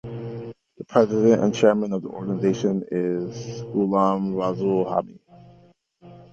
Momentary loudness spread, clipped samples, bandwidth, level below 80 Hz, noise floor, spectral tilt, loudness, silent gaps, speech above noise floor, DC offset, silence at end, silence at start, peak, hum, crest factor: 16 LU; under 0.1%; 7.6 kHz; -60 dBFS; -55 dBFS; -7 dB/octave; -22 LUFS; none; 34 dB; under 0.1%; 0.1 s; 0.05 s; -2 dBFS; none; 22 dB